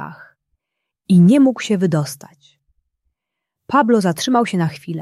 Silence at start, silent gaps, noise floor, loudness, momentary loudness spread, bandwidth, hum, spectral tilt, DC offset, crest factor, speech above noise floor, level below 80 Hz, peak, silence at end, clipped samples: 0 s; none; -81 dBFS; -16 LUFS; 13 LU; 13 kHz; none; -6.5 dB/octave; under 0.1%; 16 dB; 66 dB; -62 dBFS; -2 dBFS; 0 s; under 0.1%